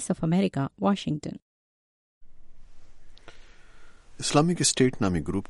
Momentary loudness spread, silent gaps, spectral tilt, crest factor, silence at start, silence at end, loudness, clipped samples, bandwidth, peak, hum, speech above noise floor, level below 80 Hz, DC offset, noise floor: 11 LU; 1.42-2.21 s; -4.5 dB/octave; 20 dB; 0 s; 0.05 s; -25 LUFS; under 0.1%; 11.5 kHz; -8 dBFS; none; over 65 dB; -50 dBFS; under 0.1%; under -90 dBFS